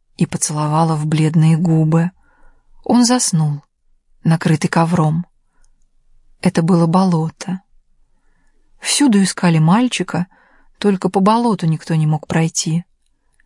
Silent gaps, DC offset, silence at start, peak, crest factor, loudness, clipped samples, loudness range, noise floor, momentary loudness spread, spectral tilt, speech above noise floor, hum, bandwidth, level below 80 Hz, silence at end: none; under 0.1%; 0.2 s; -2 dBFS; 14 dB; -16 LUFS; under 0.1%; 4 LU; -59 dBFS; 10 LU; -5.5 dB/octave; 45 dB; none; 11.5 kHz; -54 dBFS; 0.65 s